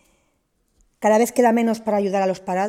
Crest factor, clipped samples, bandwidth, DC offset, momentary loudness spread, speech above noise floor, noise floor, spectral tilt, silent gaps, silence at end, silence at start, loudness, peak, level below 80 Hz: 16 dB; under 0.1%; 15.5 kHz; under 0.1%; 5 LU; 49 dB; -68 dBFS; -5.5 dB/octave; none; 0 s; 1 s; -19 LUFS; -4 dBFS; -64 dBFS